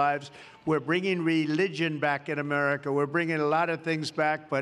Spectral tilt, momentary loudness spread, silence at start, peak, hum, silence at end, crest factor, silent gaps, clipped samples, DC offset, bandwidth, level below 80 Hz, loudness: -6 dB/octave; 4 LU; 0 s; -12 dBFS; none; 0 s; 16 dB; none; under 0.1%; under 0.1%; 11.5 kHz; -74 dBFS; -27 LUFS